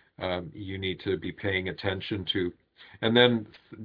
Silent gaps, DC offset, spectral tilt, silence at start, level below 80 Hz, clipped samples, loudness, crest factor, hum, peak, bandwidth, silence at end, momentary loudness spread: none; under 0.1%; -8 dB/octave; 0.2 s; -60 dBFS; under 0.1%; -28 LUFS; 24 dB; none; -6 dBFS; 5.2 kHz; 0 s; 13 LU